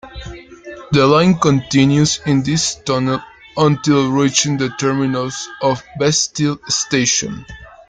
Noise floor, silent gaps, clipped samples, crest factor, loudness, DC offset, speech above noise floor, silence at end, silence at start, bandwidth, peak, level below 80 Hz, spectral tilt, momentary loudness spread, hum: -35 dBFS; none; under 0.1%; 16 dB; -15 LUFS; under 0.1%; 20 dB; 0.2 s; 0.05 s; 9.6 kHz; 0 dBFS; -44 dBFS; -4.5 dB/octave; 15 LU; none